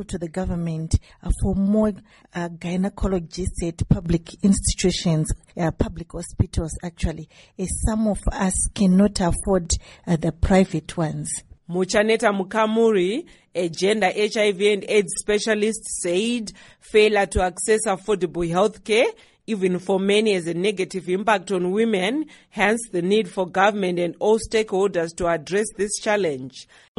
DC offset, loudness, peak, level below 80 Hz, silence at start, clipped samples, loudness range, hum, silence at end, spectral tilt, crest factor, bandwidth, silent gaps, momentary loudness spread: under 0.1%; -22 LUFS; -4 dBFS; -34 dBFS; 0 s; under 0.1%; 4 LU; none; 0.35 s; -5 dB/octave; 18 dB; 11.5 kHz; none; 10 LU